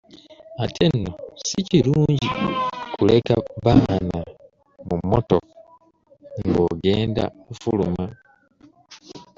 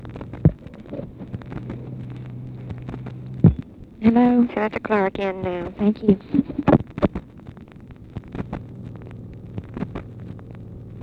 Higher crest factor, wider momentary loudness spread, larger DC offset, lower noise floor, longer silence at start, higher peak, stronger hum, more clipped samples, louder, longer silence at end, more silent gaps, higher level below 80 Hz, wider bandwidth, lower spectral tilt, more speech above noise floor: about the same, 20 dB vs 22 dB; second, 14 LU vs 20 LU; neither; first, -55 dBFS vs -42 dBFS; first, 0.15 s vs 0 s; about the same, -2 dBFS vs 0 dBFS; neither; neither; about the same, -21 LUFS vs -22 LUFS; first, 0.15 s vs 0 s; neither; about the same, -44 dBFS vs -40 dBFS; first, 7.6 kHz vs 5 kHz; second, -6.5 dB/octave vs -10 dB/octave; first, 35 dB vs 22 dB